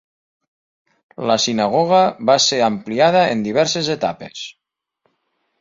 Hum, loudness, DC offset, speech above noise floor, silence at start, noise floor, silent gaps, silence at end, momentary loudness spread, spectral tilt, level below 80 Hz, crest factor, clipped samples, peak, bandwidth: none; -16 LUFS; under 0.1%; 53 dB; 1.2 s; -69 dBFS; none; 1.1 s; 14 LU; -3.5 dB/octave; -60 dBFS; 18 dB; under 0.1%; -2 dBFS; 7.8 kHz